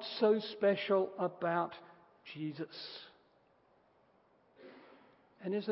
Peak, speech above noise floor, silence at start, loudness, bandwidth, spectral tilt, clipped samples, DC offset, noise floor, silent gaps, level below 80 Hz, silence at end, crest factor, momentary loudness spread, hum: -18 dBFS; 35 dB; 0 s; -35 LUFS; 5.6 kHz; -4 dB/octave; under 0.1%; under 0.1%; -70 dBFS; none; -88 dBFS; 0 s; 20 dB; 24 LU; none